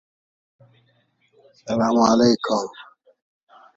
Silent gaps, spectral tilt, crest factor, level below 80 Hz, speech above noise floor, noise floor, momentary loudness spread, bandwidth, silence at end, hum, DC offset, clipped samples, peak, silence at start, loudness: none; -5 dB/octave; 22 dB; -60 dBFS; 45 dB; -64 dBFS; 16 LU; 7.8 kHz; 0.95 s; none; under 0.1%; under 0.1%; -2 dBFS; 1.65 s; -19 LUFS